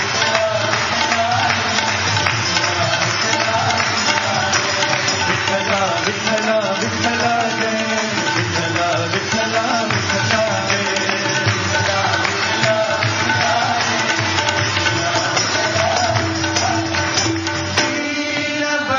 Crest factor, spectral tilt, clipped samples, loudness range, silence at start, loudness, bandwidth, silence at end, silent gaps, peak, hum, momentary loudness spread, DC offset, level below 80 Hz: 18 dB; -3 dB/octave; under 0.1%; 2 LU; 0 s; -17 LUFS; 9.4 kHz; 0 s; none; 0 dBFS; none; 2 LU; under 0.1%; -54 dBFS